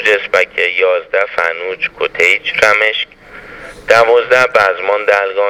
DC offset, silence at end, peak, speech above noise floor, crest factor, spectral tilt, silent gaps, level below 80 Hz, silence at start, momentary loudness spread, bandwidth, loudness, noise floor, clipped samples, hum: under 0.1%; 0 s; 0 dBFS; 21 dB; 12 dB; -2 dB/octave; none; -50 dBFS; 0 s; 11 LU; 15.5 kHz; -12 LUFS; -33 dBFS; 0.2%; none